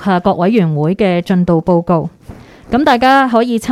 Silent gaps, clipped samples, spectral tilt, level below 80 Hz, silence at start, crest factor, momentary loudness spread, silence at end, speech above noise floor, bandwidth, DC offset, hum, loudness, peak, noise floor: none; under 0.1%; -7 dB/octave; -40 dBFS; 0 s; 12 dB; 7 LU; 0 s; 24 dB; 13.5 kHz; under 0.1%; none; -12 LUFS; 0 dBFS; -35 dBFS